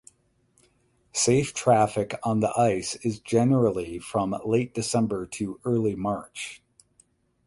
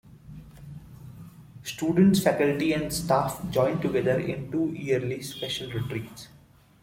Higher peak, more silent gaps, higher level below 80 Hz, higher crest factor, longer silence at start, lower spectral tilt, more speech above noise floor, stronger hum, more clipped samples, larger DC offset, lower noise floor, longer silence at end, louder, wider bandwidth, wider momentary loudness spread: about the same, -8 dBFS vs -6 dBFS; neither; about the same, -56 dBFS vs -54 dBFS; about the same, 18 dB vs 20 dB; first, 1.15 s vs 0.05 s; about the same, -5.5 dB/octave vs -5.5 dB/octave; first, 42 dB vs 20 dB; neither; neither; neither; first, -66 dBFS vs -46 dBFS; first, 0.9 s vs 0.55 s; about the same, -25 LUFS vs -26 LUFS; second, 11.5 kHz vs 16.5 kHz; second, 11 LU vs 24 LU